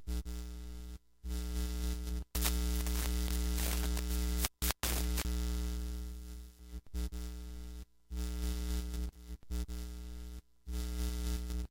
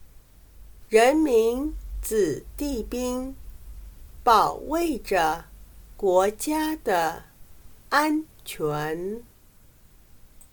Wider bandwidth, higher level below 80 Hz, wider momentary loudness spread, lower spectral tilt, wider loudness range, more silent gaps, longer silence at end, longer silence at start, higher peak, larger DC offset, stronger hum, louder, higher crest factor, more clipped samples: second, 17 kHz vs 19.5 kHz; first, -38 dBFS vs -44 dBFS; about the same, 15 LU vs 15 LU; about the same, -4 dB/octave vs -4.5 dB/octave; first, 7 LU vs 4 LU; neither; about the same, 0.05 s vs 0.1 s; about the same, 0 s vs 0 s; about the same, -6 dBFS vs -6 dBFS; neither; neither; second, -39 LUFS vs -24 LUFS; first, 30 dB vs 20 dB; neither